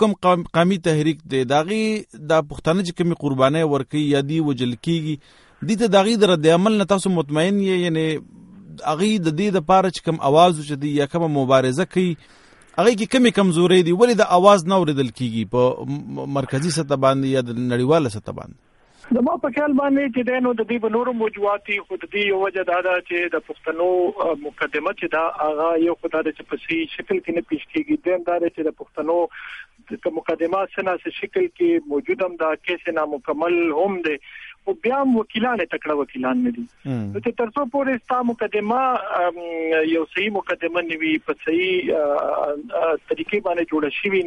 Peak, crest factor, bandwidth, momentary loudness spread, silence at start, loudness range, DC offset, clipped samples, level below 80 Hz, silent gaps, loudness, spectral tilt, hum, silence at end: 0 dBFS; 20 dB; 11.5 kHz; 9 LU; 0 s; 6 LU; under 0.1%; under 0.1%; -56 dBFS; none; -20 LUFS; -6 dB/octave; none; 0 s